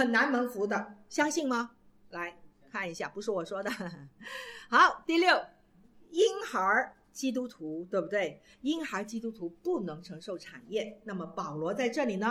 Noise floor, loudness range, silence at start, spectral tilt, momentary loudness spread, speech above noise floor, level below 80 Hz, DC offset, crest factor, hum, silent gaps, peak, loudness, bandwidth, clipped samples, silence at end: -60 dBFS; 8 LU; 0 s; -4 dB/octave; 16 LU; 28 dB; -70 dBFS; under 0.1%; 22 dB; none; none; -10 dBFS; -31 LUFS; 16.5 kHz; under 0.1%; 0 s